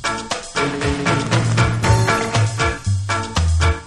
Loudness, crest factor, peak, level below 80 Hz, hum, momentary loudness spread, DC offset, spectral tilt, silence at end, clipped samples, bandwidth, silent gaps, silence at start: -18 LUFS; 16 dB; -2 dBFS; -28 dBFS; none; 6 LU; under 0.1%; -5 dB/octave; 0 s; under 0.1%; 12 kHz; none; 0 s